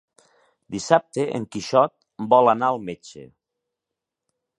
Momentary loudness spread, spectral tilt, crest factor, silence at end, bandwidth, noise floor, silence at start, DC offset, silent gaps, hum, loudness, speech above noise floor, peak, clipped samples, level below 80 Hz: 18 LU; -5 dB/octave; 22 dB; 1.35 s; 11 kHz; -85 dBFS; 0.7 s; under 0.1%; none; none; -21 LUFS; 64 dB; 0 dBFS; under 0.1%; -64 dBFS